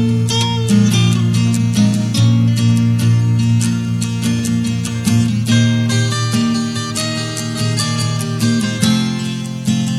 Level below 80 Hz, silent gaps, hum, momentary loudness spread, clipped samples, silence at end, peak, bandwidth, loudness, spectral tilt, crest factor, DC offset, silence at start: -44 dBFS; none; none; 6 LU; under 0.1%; 0 s; 0 dBFS; 14 kHz; -15 LUFS; -5.5 dB/octave; 14 dB; under 0.1%; 0 s